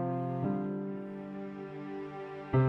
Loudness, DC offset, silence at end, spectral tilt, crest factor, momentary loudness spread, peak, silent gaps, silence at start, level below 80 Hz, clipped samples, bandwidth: -37 LUFS; under 0.1%; 0 s; -10.5 dB/octave; 18 dB; 9 LU; -16 dBFS; none; 0 s; -60 dBFS; under 0.1%; 4.3 kHz